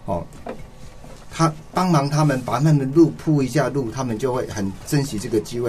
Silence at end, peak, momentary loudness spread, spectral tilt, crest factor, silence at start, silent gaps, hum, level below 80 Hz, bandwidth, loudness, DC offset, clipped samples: 0 s; -4 dBFS; 13 LU; -6.5 dB/octave; 16 dB; 0 s; none; none; -44 dBFS; 14 kHz; -21 LUFS; 0.4%; under 0.1%